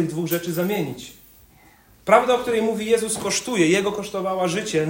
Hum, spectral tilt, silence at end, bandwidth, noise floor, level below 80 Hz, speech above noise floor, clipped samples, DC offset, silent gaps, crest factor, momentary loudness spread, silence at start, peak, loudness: none; -4 dB/octave; 0 s; 16.5 kHz; -53 dBFS; -58 dBFS; 31 dB; under 0.1%; under 0.1%; none; 22 dB; 10 LU; 0 s; 0 dBFS; -21 LUFS